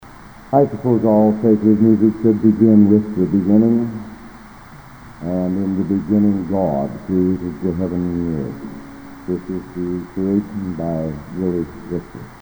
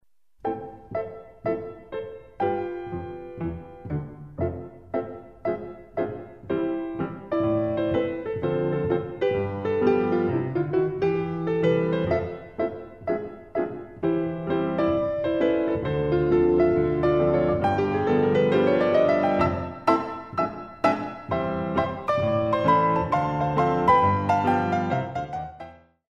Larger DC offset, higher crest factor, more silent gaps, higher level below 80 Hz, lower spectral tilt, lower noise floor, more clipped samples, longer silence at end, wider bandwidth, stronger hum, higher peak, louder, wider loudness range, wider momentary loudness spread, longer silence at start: second, under 0.1% vs 0.1%; about the same, 16 dB vs 18 dB; neither; about the same, -44 dBFS vs -48 dBFS; first, -10 dB/octave vs -8.5 dB/octave; second, -39 dBFS vs -45 dBFS; neither; second, 0.05 s vs 0.35 s; first, over 20 kHz vs 7.2 kHz; neither; first, 0 dBFS vs -6 dBFS; first, -17 LUFS vs -25 LUFS; about the same, 9 LU vs 10 LU; about the same, 14 LU vs 13 LU; second, 0 s vs 0.45 s